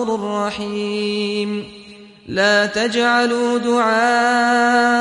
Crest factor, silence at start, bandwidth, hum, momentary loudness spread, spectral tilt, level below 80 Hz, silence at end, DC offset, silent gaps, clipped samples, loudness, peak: 14 dB; 0 s; 11.5 kHz; none; 9 LU; -3.5 dB/octave; -58 dBFS; 0 s; under 0.1%; none; under 0.1%; -17 LUFS; -4 dBFS